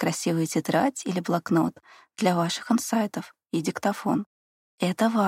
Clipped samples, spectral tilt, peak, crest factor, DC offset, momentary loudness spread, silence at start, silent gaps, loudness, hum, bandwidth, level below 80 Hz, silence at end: under 0.1%; -5 dB/octave; -8 dBFS; 18 dB; under 0.1%; 7 LU; 0 s; 4.26-4.78 s; -26 LUFS; none; 16 kHz; -72 dBFS; 0 s